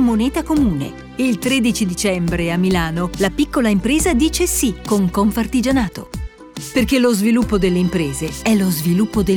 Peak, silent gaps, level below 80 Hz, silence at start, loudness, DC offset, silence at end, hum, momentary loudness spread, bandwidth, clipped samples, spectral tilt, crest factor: -4 dBFS; none; -32 dBFS; 0 s; -17 LUFS; under 0.1%; 0 s; none; 7 LU; 19.5 kHz; under 0.1%; -5 dB/octave; 12 dB